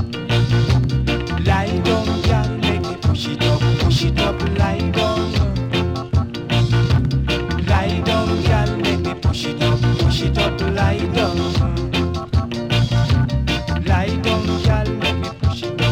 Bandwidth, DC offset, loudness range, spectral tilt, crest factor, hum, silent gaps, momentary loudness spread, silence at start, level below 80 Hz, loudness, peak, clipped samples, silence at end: 13 kHz; under 0.1%; 1 LU; -6.5 dB/octave; 10 dB; none; none; 4 LU; 0 s; -26 dBFS; -18 LUFS; -6 dBFS; under 0.1%; 0 s